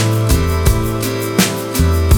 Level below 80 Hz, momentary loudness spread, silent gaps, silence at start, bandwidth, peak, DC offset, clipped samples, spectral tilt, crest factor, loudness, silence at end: -20 dBFS; 3 LU; none; 0 s; over 20 kHz; 0 dBFS; under 0.1%; under 0.1%; -5 dB/octave; 14 dB; -15 LUFS; 0 s